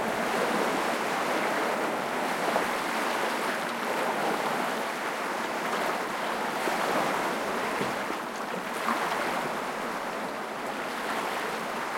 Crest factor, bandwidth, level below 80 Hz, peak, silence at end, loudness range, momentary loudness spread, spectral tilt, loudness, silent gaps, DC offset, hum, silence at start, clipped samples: 18 dB; 16.5 kHz; -66 dBFS; -10 dBFS; 0 s; 3 LU; 5 LU; -3 dB/octave; -29 LUFS; none; under 0.1%; none; 0 s; under 0.1%